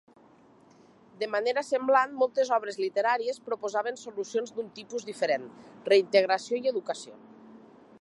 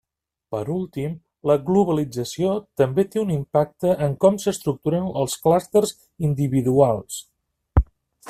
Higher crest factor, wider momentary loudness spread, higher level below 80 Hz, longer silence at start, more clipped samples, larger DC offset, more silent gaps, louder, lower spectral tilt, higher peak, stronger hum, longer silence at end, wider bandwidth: about the same, 22 dB vs 18 dB; first, 13 LU vs 10 LU; second, -82 dBFS vs -38 dBFS; first, 1.2 s vs 0.5 s; neither; neither; neither; second, -28 LUFS vs -22 LUFS; second, -3 dB/octave vs -6.5 dB/octave; second, -8 dBFS vs -4 dBFS; neither; first, 0.45 s vs 0 s; second, 11.5 kHz vs 15 kHz